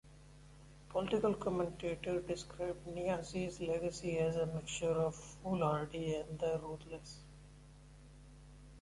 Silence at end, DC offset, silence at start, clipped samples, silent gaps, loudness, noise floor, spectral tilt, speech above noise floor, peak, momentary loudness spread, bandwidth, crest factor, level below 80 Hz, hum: 0 s; under 0.1%; 0.05 s; under 0.1%; none; -39 LUFS; -58 dBFS; -6 dB/octave; 20 dB; -22 dBFS; 24 LU; 11.5 kHz; 18 dB; -58 dBFS; none